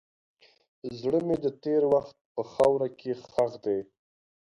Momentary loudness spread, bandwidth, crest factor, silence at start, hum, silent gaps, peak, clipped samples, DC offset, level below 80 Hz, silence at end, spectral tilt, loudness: 13 LU; 11 kHz; 20 dB; 0.85 s; none; 2.21-2.35 s; -10 dBFS; under 0.1%; under 0.1%; -64 dBFS; 0.7 s; -7.5 dB/octave; -28 LUFS